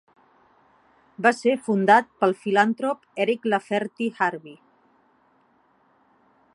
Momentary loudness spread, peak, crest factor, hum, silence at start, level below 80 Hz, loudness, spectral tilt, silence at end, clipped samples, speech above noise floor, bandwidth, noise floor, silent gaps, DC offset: 10 LU; -2 dBFS; 22 dB; none; 1.2 s; -78 dBFS; -22 LUFS; -5.5 dB/octave; 2 s; under 0.1%; 40 dB; 11.5 kHz; -62 dBFS; none; under 0.1%